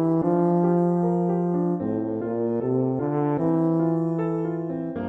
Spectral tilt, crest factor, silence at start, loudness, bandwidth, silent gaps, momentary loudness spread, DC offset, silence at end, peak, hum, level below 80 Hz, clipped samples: -12 dB/octave; 12 dB; 0 s; -24 LUFS; 2.8 kHz; none; 6 LU; under 0.1%; 0 s; -10 dBFS; none; -62 dBFS; under 0.1%